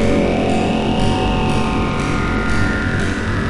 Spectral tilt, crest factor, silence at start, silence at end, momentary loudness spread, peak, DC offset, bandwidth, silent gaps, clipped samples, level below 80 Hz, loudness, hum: -6 dB/octave; 12 dB; 0 s; 0 s; 2 LU; -4 dBFS; 2%; 11.5 kHz; none; under 0.1%; -26 dBFS; -18 LUFS; none